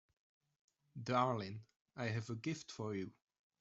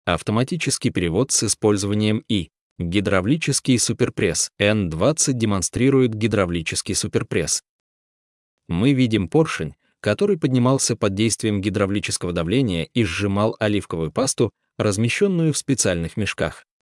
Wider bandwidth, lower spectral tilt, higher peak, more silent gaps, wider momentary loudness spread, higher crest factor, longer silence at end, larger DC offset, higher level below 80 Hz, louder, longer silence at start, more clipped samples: second, 8 kHz vs 12 kHz; first, -6 dB/octave vs -4.5 dB/octave; second, -20 dBFS vs -4 dBFS; second, 1.76-1.85 s vs 2.61-2.76 s, 7.69-8.58 s; first, 17 LU vs 6 LU; first, 22 dB vs 16 dB; first, 0.5 s vs 0.25 s; neither; second, -78 dBFS vs -50 dBFS; second, -42 LUFS vs -21 LUFS; first, 0.95 s vs 0.05 s; neither